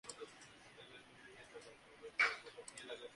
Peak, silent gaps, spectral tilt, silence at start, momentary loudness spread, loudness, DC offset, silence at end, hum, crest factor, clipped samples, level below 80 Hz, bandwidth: -22 dBFS; none; -1 dB/octave; 0.05 s; 23 LU; -41 LUFS; under 0.1%; 0 s; none; 26 dB; under 0.1%; -80 dBFS; 11.5 kHz